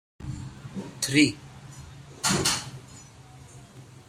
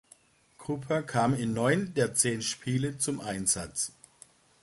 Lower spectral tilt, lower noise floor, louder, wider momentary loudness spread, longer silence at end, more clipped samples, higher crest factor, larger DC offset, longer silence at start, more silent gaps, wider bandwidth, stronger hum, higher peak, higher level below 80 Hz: about the same, -3 dB/octave vs -4 dB/octave; second, -48 dBFS vs -61 dBFS; first, -25 LUFS vs -29 LUFS; first, 26 LU vs 8 LU; second, 0.05 s vs 0.75 s; neither; about the same, 22 dB vs 20 dB; neither; second, 0.2 s vs 0.6 s; neither; first, 16 kHz vs 12 kHz; neither; about the same, -8 dBFS vs -10 dBFS; first, -54 dBFS vs -60 dBFS